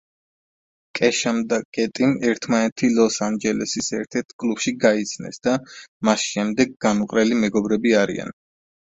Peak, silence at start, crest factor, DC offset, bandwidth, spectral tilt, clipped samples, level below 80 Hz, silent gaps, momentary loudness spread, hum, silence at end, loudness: -2 dBFS; 0.95 s; 20 dB; under 0.1%; 8 kHz; -4 dB/octave; under 0.1%; -58 dBFS; 1.65-1.73 s, 2.72-2.76 s, 4.33-4.39 s, 5.88-6.00 s; 7 LU; none; 0.55 s; -21 LUFS